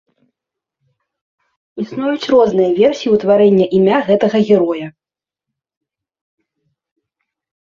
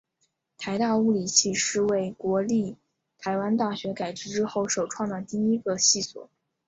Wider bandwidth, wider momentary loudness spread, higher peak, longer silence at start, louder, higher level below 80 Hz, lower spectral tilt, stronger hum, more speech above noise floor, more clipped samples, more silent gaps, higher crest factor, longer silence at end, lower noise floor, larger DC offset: second, 7.2 kHz vs 8 kHz; first, 14 LU vs 11 LU; first, -2 dBFS vs -6 dBFS; first, 1.75 s vs 0.6 s; first, -13 LUFS vs -25 LUFS; first, -58 dBFS vs -66 dBFS; first, -7 dB/octave vs -3 dB/octave; neither; first, 77 dB vs 49 dB; neither; neither; second, 14 dB vs 22 dB; first, 2.8 s vs 0.45 s; first, -89 dBFS vs -74 dBFS; neither